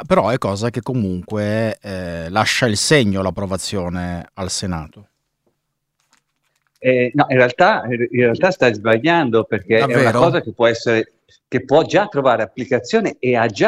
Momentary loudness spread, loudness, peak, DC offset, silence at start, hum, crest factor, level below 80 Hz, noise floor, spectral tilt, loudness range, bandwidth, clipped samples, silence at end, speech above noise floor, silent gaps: 10 LU; -17 LUFS; 0 dBFS; under 0.1%; 0 s; none; 16 dB; -48 dBFS; -73 dBFS; -5 dB/octave; 9 LU; 15.5 kHz; under 0.1%; 0 s; 56 dB; none